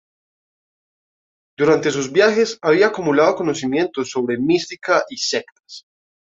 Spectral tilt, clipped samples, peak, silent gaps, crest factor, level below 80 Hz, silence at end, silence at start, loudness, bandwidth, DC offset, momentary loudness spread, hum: -4 dB/octave; under 0.1%; -2 dBFS; 5.52-5.63 s; 18 dB; -62 dBFS; 0.55 s; 1.6 s; -18 LUFS; 7.8 kHz; under 0.1%; 6 LU; none